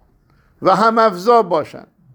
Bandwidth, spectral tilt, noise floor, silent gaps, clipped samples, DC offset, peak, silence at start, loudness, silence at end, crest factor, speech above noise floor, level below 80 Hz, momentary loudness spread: over 20 kHz; -6 dB/octave; -55 dBFS; none; under 0.1%; under 0.1%; 0 dBFS; 0.6 s; -14 LUFS; 0.35 s; 16 dB; 40 dB; -60 dBFS; 8 LU